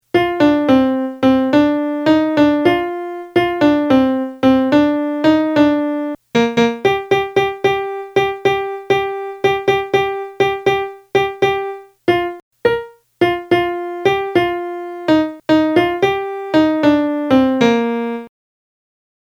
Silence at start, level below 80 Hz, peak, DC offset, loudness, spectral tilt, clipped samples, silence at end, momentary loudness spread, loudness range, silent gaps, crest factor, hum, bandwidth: 0.15 s; -48 dBFS; 0 dBFS; under 0.1%; -16 LUFS; -6 dB/octave; under 0.1%; 1.1 s; 8 LU; 4 LU; 12.42-12.51 s; 16 dB; none; 14 kHz